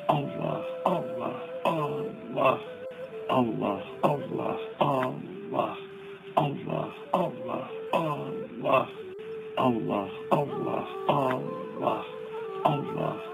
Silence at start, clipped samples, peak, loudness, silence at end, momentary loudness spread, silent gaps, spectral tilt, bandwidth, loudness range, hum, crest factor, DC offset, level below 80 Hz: 0 s; under 0.1%; -8 dBFS; -30 LUFS; 0 s; 10 LU; none; -7.5 dB/octave; 16 kHz; 2 LU; none; 22 dB; under 0.1%; -70 dBFS